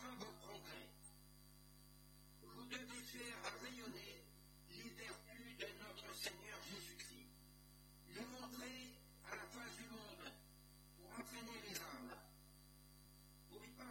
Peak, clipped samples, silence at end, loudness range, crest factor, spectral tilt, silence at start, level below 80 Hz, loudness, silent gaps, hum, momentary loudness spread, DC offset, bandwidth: -34 dBFS; under 0.1%; 0 s; 2 LU; 24 dB; -2.5 dB/octave; 0 s; -70 dBFS; -54 LUFS; none; 50 Hz at -65 dBFS; 15 LU; under 0.1%; 17.5 kHz